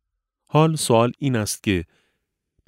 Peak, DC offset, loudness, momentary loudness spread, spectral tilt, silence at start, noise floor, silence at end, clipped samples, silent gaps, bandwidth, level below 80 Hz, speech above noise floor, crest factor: -2 dBFS; under 0.1%; -21 LUFS; 6 LU; -5.5 dB/octave; 0.55 s; -75 dBFS; 0.85 s; under 0.1%; none; 16 kHz; -52 dBFS; 56 dB; 20 dB